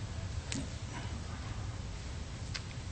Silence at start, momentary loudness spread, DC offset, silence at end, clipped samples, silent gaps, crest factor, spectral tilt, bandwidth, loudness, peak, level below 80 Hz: 0 s; 4 LU; under 0.1%; 0 s; under 0.1%; none; 24 dB; -4.5 dB/octave; 8.4 kHz; -42 LUFS; -16 dBFS; -46 dBFS